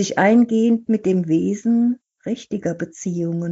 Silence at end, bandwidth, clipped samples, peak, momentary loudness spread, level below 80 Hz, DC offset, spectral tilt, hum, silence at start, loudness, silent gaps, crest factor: 0 s; 8 kHz; under 0.1%; -4 dBFS; 12 LU; -64 dBFS; under 0.1%; -6.5 dB/octave; none; 0 s; -20 LUFS; none; 14 dB